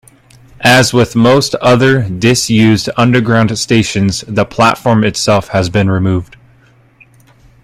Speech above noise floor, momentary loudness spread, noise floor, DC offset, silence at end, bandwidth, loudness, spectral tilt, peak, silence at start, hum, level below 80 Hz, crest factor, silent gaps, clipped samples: 36 dB; 6 LU; -46 dBFS; under 0.1%; 1.4 s; 15.5 kHz; -11 LUFS; -5 dB/octave; 0 dBFS; 0.6 s; none; -40 dBFS; 12 dB; none; under 0.1%